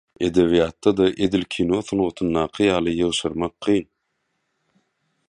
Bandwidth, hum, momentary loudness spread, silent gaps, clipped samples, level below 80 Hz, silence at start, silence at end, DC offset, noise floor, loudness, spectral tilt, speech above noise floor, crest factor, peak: 11 kHz; none; 5 LU; none; under 0.1%; -46 dBFS; 0.2 s; 1.45 s; under 0.1%; -74 dBFS; -21 LUFS; -5.5 dB/octave; 53 dB; 18 dB; -4 dBFS